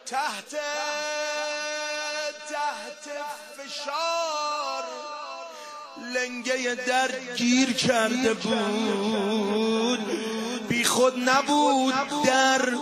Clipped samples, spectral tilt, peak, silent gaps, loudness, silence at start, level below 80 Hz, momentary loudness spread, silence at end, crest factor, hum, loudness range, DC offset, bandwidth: under 0.1%; -2.5 dB/octave; -6 dBFS; none; -25 LUFS; 0.05 s; -70 dBFS; 14 LU; 0 s; 20 dB; none; 7 LU; under 0.1%; 15.5 kHz